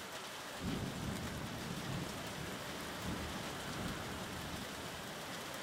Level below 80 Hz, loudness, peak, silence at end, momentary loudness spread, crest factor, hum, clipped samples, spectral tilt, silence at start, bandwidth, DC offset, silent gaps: -58 dBFS; -43 LUFS; -28 dBFS; 0 s; 3 LU; 14 dB; none; under 0.1%; -4 dB/octave; 0 s; 16 kHz; under 0.1%; none